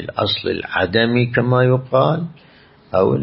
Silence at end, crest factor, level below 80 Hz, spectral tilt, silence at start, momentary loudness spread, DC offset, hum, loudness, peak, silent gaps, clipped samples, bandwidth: 0 s; 16 dB; -50 dBFS; -11.5 dB/octave; 0 s; 6 LU; under 0.1%; none; -17 LUFS; -2 dBFS; none; under 0.1%; 5.8 kHz